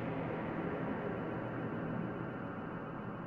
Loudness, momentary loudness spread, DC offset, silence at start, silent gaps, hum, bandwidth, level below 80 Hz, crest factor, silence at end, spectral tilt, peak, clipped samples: -40 LUFS; 4 LU; under 0.1%; 0 s; none; none; 5.2 kHz; -62 dBFS; 14 dB; 0 s; -9.5 dB/octave; -26 dBFS; under 0.1%